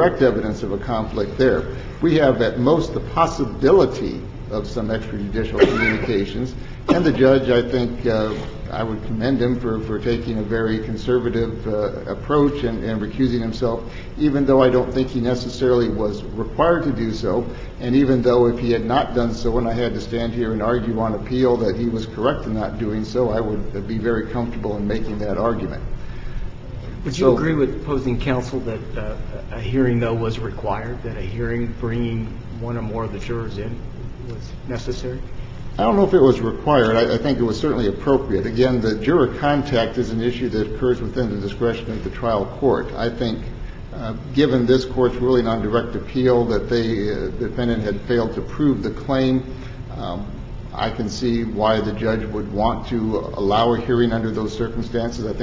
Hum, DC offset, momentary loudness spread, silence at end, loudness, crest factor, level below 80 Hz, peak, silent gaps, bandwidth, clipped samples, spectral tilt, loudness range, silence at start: none; under 0.1%; 13 LU; 0 s; -21 LUFS; 20 dB; -34 dBFS; 0 dBFS; none; 7.6 kHz; under 0.1%; -7.5 dB/octave; 5 LU; 0 s